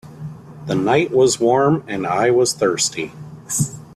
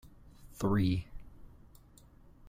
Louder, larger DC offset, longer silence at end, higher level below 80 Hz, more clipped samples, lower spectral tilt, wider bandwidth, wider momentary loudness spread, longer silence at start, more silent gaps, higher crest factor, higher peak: first, -18 LUFS vs -33 LUFS; neither; about the same, 0 s vs 0 s; about the same, -54 dBFS vs -52 dBFS; neither; second, -4.5 dB/octave vs -7.5 dB/octave; second, 14 kHz vs 15.5 kHz; second, 19 LU vs 26 LU; about the same, 0.05 s vs 0.05 s; neither; about the same, 16 dB vs 18 dB; first, -2 dBFS vs -18 dBFS